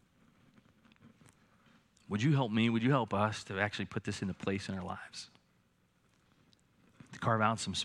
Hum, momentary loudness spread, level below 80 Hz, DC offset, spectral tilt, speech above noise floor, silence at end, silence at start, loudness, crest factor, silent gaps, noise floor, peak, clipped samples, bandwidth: none; 14 LU; -74 dBFS; under 0.1%; -5.5 dB/octave; 39 dB; 0 s; 1.05 s; -34 LUFS; 22 dB; none; -72 dBFS; -14 dBFS; under 0.1%; 11.5 kHz